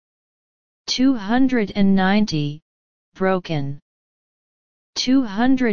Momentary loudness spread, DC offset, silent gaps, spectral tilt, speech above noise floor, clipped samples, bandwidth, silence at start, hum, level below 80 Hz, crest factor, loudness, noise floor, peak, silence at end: 13 LU; 3%; 2.62-3.12 s, 3.82-4.93 s; -5.5 dB/octave; over 72 dB; under 0.1%; 7.2 kHz; 0.85 s; none; -46 dBFS; 16 dB; -20 LUFS; under -90 dBFS; -4 dBFS; 0 s